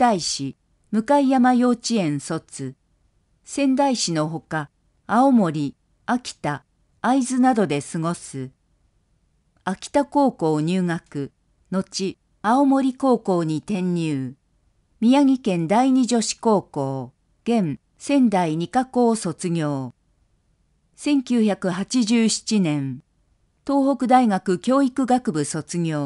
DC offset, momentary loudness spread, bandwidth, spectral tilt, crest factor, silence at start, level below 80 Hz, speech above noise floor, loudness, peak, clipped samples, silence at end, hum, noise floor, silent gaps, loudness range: under 0.1%; 14 LU; 11.5 kHz; -5.5 dB/octave; 18 dB; 0 s; -62 dBFS; 44 dB; -21 LUFS; -4 dBFS; under 0.1%; 0 s; none; -65 dBFS; none; 4 LU